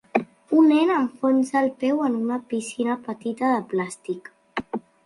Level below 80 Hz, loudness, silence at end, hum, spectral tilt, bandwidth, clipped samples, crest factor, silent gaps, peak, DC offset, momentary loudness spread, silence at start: -68 dBFS; -23 LUFS; 0.25 s; none; -5.5 dB/octave; 11.5 kHz; under 0.1%; 20 dB; none; -4 dBFS; under 0.1%; 15 LU; 0.15 s